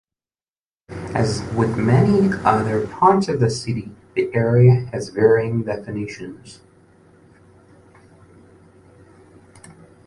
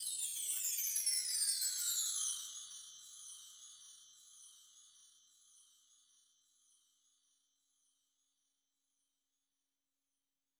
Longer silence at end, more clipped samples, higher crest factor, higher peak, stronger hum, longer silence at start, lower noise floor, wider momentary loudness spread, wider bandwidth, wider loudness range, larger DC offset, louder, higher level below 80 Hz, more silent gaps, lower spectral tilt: second, 0.35 s vs 5.55 s; neither; second, 18 dB vs 24 dB; first, -2 dBFS vs -22 dBFS; neither; first, 0.9 s vs 0 s; about the same, under -90 dBFS vs under -90 dBFS; second, 14 LU vs 24 LU; second, 11 kHz vs over 20 kHz; second, 13 LU vs 23 LU; neither; first, -19 LUFS vs -36 LUFS; first, -48 dBFS vs under -90 dBFS; neither; first, -7.5 dB/octave vs 5.5 dB/octave